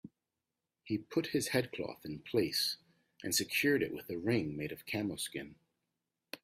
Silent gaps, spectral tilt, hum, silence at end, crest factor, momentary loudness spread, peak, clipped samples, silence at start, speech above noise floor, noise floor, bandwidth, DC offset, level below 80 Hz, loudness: none; -3.5 dB/octave; none; 0.05 s; 20 dB; 15 LU; -18 dBFS; under 0.1%; 0.05 s; 54 dB; -90 dBFS; 16 kHz; under 0.1%; -70 dBFS; -35 LUFS